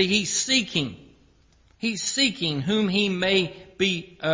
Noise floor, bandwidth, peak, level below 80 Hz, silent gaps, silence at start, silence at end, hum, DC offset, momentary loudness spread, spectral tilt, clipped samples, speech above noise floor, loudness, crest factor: -59 dBFS; 7.8 kHz; -8 dBFS; -58 dBFS; none; 0 s; 0 s; none; under 0.1%; 8 LU; -3 dB/octave; under 0.1%; 35 dB; -23 LUFS; 18 dB